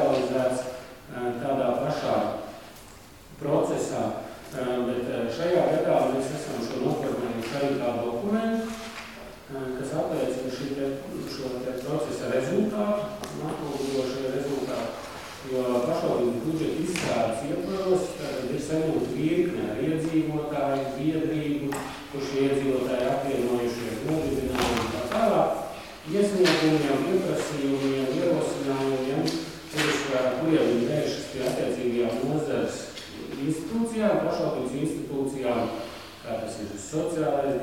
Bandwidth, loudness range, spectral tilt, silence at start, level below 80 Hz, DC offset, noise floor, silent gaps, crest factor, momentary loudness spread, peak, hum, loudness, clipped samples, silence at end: 17 kHz; 5 LU; -5.5 dB/octave; 0 s; -54 dBFS; 0.1%; -48 dBFS; none; 18 dB; 10 LU; -8 dBFS; none; -27 LUFS; under 0.1%; 0 s